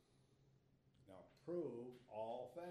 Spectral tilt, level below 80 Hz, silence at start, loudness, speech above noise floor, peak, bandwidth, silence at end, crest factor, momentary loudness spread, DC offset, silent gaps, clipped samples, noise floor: -7.5 dB/octave; -86 dBFS; 0.3 s; -51 LUFS; 26 dB; -36 dBFS; 13 kHz; 0 s; 18 dB; 17 LU; under 0.1%; none; under 0.1%; -75 dBFS